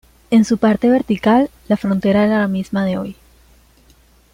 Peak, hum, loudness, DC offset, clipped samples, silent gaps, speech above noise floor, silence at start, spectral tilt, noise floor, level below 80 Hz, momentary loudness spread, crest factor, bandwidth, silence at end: -4 dBFS; none; -16 LUFS; under 0.1%; under 0.1%; none; 36 dB; 0.3 s; -7 dB/octave; -51 dBFS; -48 dBFS; 6 LU; 14 dB; 11 kHz; 1.2 s